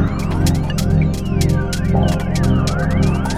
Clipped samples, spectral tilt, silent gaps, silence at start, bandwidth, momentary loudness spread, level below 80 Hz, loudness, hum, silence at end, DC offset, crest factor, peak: under 0.1%; -6.5 dB/octave; none; 0 s; 15.5 kHz; 2 LU; -24 dBFS; -17 LUFS; none; 0 s; under 0.1%; 14 dB; -2 dBFS